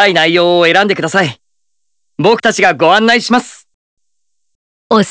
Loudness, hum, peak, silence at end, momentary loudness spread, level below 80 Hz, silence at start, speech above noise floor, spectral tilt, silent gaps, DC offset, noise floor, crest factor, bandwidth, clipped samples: -10 LUFS; none; 0 dBFS; 0 s; 6 LU; -56 dBFS; 0 s; 63 dB; -4 dB/octave; 3.74-3.97 s, 4.55-4.90 s; under 0.1%; -73 dBFS; 12 dB; 8 kHz; 0.3%